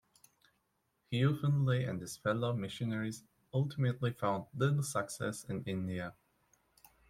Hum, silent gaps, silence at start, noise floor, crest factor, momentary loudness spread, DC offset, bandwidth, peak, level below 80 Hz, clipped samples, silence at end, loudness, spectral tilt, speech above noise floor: none; none; 1.1 s; -80 dBFS; 18 dB; 8 LU; under 0.1%; 15 kHz; -18 dBFS; -70 dBFS; under 0.1%; 0.95 s; -36 LUFS; -6 dB/octave; 45 dB